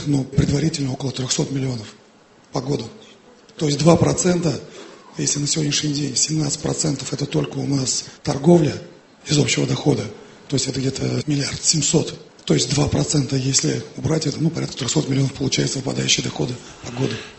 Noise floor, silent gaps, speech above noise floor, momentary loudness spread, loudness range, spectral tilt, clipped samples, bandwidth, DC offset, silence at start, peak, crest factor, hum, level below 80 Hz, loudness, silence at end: -51 dBFS; none; 30 dB; 10 LU; 2 LU; -4.5 dB/octave; under 0.1%; 8.6 kHz; under 0.1%; 0 s; 0 dBFS; 20 dB; none; -44 dBFS; -20 LUFS; 0 s